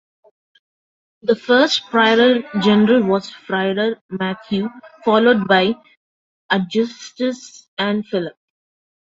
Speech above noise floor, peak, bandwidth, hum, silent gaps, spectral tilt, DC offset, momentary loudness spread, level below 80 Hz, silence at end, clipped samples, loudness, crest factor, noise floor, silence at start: over 73 dB; -2 dBFS; 7.8 kHz; none; 4.01-4.09 s, 5.97-6.49 s, 7.68-7.77 s; -5.5 dB/octave; under 0.1%; 11 LU; -62 dBFS; 0.85 s; under 0.1%; -17 LUFS; 18 dB; under -90 dBFS; 1.25 s